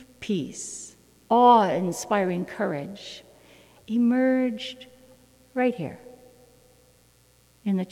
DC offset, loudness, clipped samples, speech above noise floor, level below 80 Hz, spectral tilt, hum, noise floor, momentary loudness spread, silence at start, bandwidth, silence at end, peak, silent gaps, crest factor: under 0.1%; -24 LUFS; under 0.1%; 36 dB; -66 dBFS; -5.5 dB/octave; none; -59 dBFS; 21 LU; 0 s; 14.5 kHz; 0.05 s; -6 dBFS; none; 20 dB